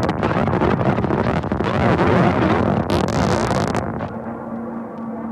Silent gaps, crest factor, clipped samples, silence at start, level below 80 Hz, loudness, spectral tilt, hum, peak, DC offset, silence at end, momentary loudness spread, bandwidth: none; 16 dB; under 0.1%; 0 s; -36 dBFS; -19 LUFS; -7 dB/octave; none; -4 dBFS; under 0.1%; 0 s; 13 LU; 13 kHz